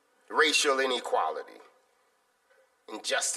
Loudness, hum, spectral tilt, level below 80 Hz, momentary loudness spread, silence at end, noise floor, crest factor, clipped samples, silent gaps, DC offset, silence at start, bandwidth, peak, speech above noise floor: -27 LUFS; none; 1.5 dB/octave; -86 dBFS; 19 LU; 0 s; -70 dBFS; 22 dB; under 0.1%; none; under 0.1%; 0.3 s; 14.5 kHz; -10 dBFS; 42 dB